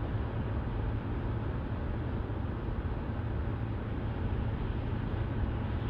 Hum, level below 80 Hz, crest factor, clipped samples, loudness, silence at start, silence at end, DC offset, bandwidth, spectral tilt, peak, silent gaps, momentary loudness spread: none; -38 dBFS; 12 dB; under 0.1%; -35 LUFS; 0 s; 0 s; under 0.1%; 5 kHz; -10 dB/octave; -22 dBFS; none; 2 LU